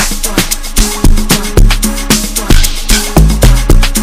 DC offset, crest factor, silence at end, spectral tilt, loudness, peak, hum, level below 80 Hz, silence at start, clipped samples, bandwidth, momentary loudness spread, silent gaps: under 0.1%; 8 dB; 0 s; -3.5 dB/octave; -10 LUFS; 0 dBFS; none; -8 dBFS; 0 s; 3%; 16 kHz; 4 LU; none